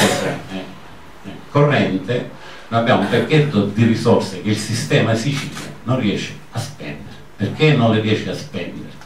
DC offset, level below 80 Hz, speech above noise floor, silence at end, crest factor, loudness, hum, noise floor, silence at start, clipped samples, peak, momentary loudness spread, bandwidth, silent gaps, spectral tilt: 1%; -52 dBFS; 23 dB; 0 s; 16 dB; -18 LUFS; none; -40 dBFS; 0 s; under 0.1%; -2 dBFS; 16 LU; 15.5 kHz; none; -6 dB/octave